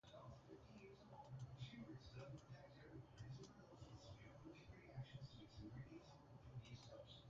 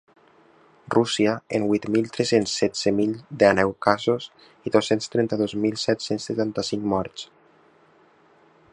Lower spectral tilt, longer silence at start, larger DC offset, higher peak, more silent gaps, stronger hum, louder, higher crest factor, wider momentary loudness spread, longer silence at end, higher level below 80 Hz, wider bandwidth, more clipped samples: about the same, -6 dB/octave vs -5 dB/octave; second, 0.05 s vs 0.9 s; neither; second, -42 dBFS vs -2 dBFS; neither; neither; second, -61 LUFS vs -23 LUFS; about the same, 18 dB vs 22 dB; about the same, 6 LU vs 7 LU; second, 0 s vs 1.45 s; second, -72 dBFS vs -58 dBFS; second, 7.4 kHz vs 11 kHz; neither